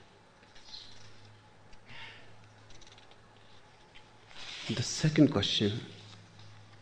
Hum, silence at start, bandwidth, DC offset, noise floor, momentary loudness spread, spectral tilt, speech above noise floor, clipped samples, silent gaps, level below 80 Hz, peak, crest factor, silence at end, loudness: none; 0.55 s; 9.8 kHz; under 0.1%; -59 dBFS; 29 LU; -5 dB/octave; 30 dB; under 0.1%; none; -62 dBFS; -10 dBFS; 26 dB; 0.05 s; -30 LUFS